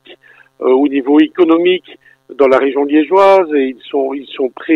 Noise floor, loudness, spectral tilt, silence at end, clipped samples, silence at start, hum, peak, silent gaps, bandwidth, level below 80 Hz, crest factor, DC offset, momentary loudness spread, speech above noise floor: -42 dBFS; -12 LUFS; -6 dB/octave; 0 s; under 0.1%; 0.1 s; none; 0 dBFS; none; 6.8 kHz; -60 dBFS; 12 dB; under 0.1%; 10 LU; 31 dB